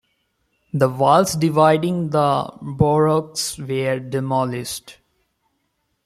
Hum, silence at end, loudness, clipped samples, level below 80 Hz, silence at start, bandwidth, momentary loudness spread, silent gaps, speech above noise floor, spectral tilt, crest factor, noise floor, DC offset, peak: none; 1.15 s; -19 LUFS; under 0.1%; -50 dBFS; 0.75 s; 15.5 kHz; 11 LU; none; 52 dB; -5.5 dB/octave; 18 dB; -71 dBFS; under 0.1%; -2 dBFS